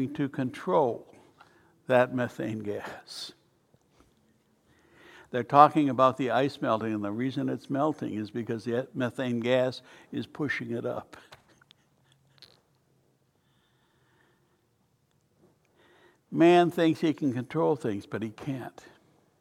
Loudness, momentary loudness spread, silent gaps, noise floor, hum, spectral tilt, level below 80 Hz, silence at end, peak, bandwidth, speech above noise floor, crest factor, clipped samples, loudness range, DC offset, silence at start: -28 LUFS; 17 LU; none; -70 dBFS; none; -7 dB/octave; -74 dBFS; 0.7 s; -4 dBFS; 14 kHz; 43 dB; 26 dB; under 0.1%; 12 LU; under 0.1%; 0 s